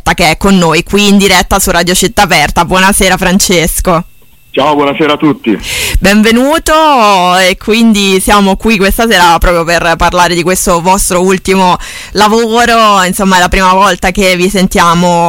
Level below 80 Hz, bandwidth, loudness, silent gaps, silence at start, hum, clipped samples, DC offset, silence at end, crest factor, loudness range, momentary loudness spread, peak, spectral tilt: -22 dBFS; 17 kHz; -7 LUFS; none; 0.05 s; none; 0.4%; under 0.1%; 0 s; 8 dB; 2 LU; 4 LU; 0 dBFS; -3.5 dB/octave